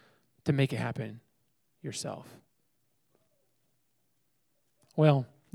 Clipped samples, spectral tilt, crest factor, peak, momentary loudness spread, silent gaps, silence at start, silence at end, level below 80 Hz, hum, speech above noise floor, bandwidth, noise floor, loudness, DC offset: under 0.1%; -6.5 dB/octave; 24 dB; -10 dBFS; 17 LU; none; 0.45 s; 0.3 s; -72 dBFS; none; 49 dB; 12.5 kHz; -78 dBFS; -31 LUFS; under 0.1%